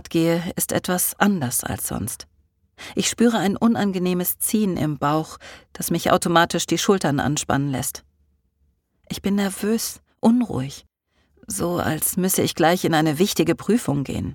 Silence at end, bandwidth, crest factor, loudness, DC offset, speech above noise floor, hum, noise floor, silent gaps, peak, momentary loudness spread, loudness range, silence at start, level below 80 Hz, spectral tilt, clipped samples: 0 s; 19 kHz; 20 dB; -21 LUFS; under 0.1%; 45 dB; none; -66 dBFS; none; -2 dBFS; 11 LU; 4 LU; 0.05 s; -50 dBFS; -4.5 dB/octave; under 0.1%